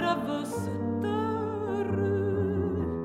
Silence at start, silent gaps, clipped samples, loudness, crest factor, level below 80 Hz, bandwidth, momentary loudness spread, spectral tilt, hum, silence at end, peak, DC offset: 0 s; none; under 0.1%; -30 LUFS; 16 dB; -52 dBFS; 14 kHz; 4 LU; -7.5 dB/octave; none; 0 s; -14 dBFS; under 0.1%